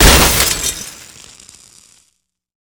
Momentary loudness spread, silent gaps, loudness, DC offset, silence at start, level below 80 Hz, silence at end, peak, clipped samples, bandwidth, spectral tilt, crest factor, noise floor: 26 LU; none; -11 LUFS; under 0.1%; 0 s; -22 dBFS; 1.8 s; 0 dBFS; 0.4%; over 20 kHz; -2.5 dB/octave; 16 dB; -65 dBFS